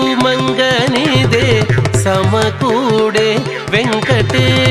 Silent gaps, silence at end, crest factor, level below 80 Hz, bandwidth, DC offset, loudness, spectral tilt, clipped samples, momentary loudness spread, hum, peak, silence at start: none; 0 s; 12 dB; -36 dBFS; 13.5 kHz; under 0.1%; -12 LUFS; -5 dB/octave; under 0.1%; 3 LU; none; 0 dBFS; 0 s